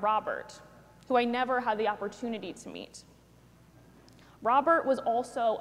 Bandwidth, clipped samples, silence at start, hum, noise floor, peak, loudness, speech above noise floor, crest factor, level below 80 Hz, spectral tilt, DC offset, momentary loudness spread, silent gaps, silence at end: 13 kHz; under 0.1%; 0 s; none; -58 dBFS; -12 dBFS; -29 LUFS; 29 dB; 18 dB; -66 dBFS; -4.5 dB/octave; under 0.1%; 19 LU; none; 0 s